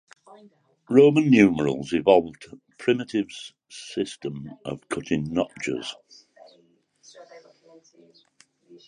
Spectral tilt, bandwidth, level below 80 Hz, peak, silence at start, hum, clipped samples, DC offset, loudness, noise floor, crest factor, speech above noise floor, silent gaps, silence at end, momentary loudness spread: -6 dB/octave; 10.5 kHz; -60 dBFS; -2 dBFS; 0.9 s; none; under 0.1%; under 0.1%; -22 LUFS; -62 dBFS; 22 dB; 39 dB; none; 1.5 s; 19 LU